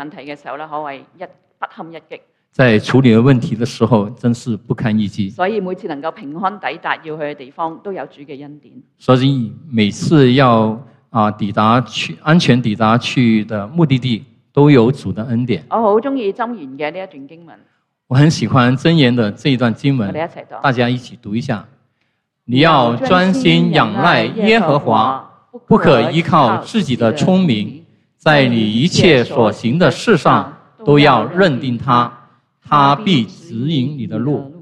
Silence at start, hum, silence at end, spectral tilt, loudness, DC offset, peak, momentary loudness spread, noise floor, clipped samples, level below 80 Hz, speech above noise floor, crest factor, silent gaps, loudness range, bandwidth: 0 s; none; 0.05 s; -6.5 dB/octave; -14 LUFS; under 0.1%; 0 dBFS; 15 LU; -67 dBFS; under 0.1%; -50 dBFS; 53 dB; 14 dB; none; 7 LU; 10.5 kHz